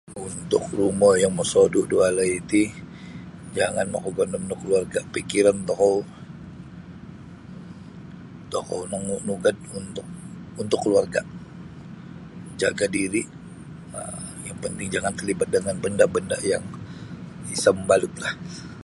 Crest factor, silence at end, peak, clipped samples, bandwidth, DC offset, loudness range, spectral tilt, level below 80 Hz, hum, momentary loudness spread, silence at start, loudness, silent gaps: 20 dB; 0.05 s; -4 dBFS; under 0.1%; 11.5 kHz; under 0.1%; 9 LU; -4.5 dB/octave; -52 dBFS; none; 21 LU; 0.05 s; -23 LUFS; none